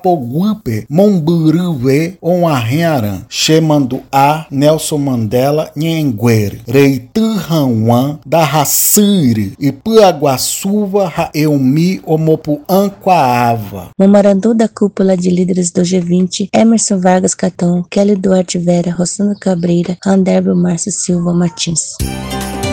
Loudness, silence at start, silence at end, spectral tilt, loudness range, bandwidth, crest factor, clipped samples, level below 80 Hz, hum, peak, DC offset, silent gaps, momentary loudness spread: -12 LUFS; 0.05 s; 0 s; -5.5 dB/octave; 2 LU; 17.5 kHz; 12 dB; 0.4%; -40 dBFS; none; 0 dBFS; under 0.1%; none; 6 LU